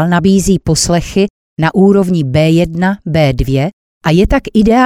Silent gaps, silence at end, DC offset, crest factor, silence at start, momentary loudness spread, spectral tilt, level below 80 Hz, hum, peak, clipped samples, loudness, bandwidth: 1.30-1.56 s, 3.73-4.01 s; 0 s; under 0.1%; 10 dB; 0 s; 6 LU; -6 dB/octave; -26 dBFS; none; 0 dBFS; under 0.1%; -12 LUFS; 15.5 kHz